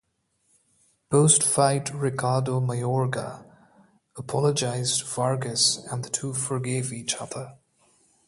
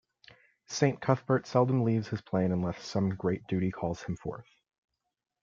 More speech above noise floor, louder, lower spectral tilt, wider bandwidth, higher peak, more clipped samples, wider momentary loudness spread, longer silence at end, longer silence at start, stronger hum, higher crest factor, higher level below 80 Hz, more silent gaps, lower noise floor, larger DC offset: first, 46 dB vs 30 dB; first, -24 LUFS vs -30 LUFS; second, -4 dB/octave vs -7 dB/octave; first, 11.5 kHz vs 7.4 kHz; first, -2 dBFS vs -10 dBFS; neither; first, 14 LU vs 11 LU; second, 0.75 s vs 1 s; first, 1.1 s vs 0.7 s; neither; about the same, 24 dB vs 22 dB; about the same, -64 dBFS vs -62 dBFS; neither; first, -71 dBFS vs -60 dBFS; neither